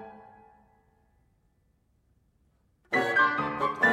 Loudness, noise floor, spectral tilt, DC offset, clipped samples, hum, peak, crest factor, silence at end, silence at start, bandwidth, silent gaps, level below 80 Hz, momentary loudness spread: -26 LUFS; -69 dBFS; -5 dB/octave; under 0.1%; under 0.1%; none; -12 dBFS; 20 dB; 0 s; 0 s; 16 kHz; none; -66 dBFS; 7 LU